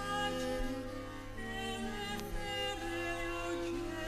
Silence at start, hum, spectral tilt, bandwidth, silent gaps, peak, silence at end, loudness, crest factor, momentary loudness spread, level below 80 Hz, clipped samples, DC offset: 0 s; none; -4 dB/octave; 14 kHz; none; -22 dBFS; 0 s; -39 LUFS; 18 dB; 7 LU; -48 dBFS; under 0.1%; under 0.1%